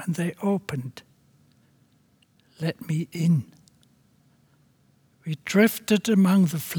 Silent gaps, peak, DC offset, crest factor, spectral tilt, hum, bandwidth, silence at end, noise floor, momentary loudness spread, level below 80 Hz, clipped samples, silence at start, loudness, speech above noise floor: none; -6 dBFS; under 0.1%; 20 dB; -6 dB/octave; none; over 20 kHz; 0 s; -63 dBFS; 15 LU; -70 dBFS; under 0.1%; 0 s; -24 LUFS; 39 dB